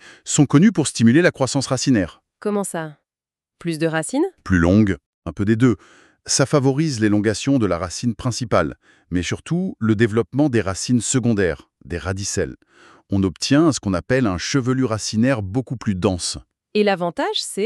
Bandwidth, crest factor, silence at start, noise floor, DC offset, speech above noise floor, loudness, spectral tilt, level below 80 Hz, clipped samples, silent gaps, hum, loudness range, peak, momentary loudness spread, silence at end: 12.5 kHz; 16 dB; 0.05 s; under -90 dBFS; under 0.1%; over 71 dB; -20 LUFS; -5 dB/octave; -46 dBFS; under 0.1%; 5.06-5.22 s; none; 3 LU; -2 dBFS; 11 LU; 0 s